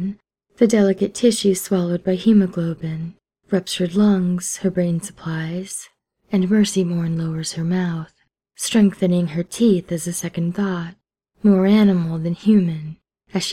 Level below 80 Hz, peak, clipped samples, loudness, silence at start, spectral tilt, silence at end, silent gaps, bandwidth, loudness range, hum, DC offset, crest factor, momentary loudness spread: -56 dBFS; -2 dBFS; under 0.1%; -19 LUFS; 0 s; -6 dB/octave; 0 s; none; 15 kHz; 3 LU; none; under 0.1%; 16 dB; 12 LU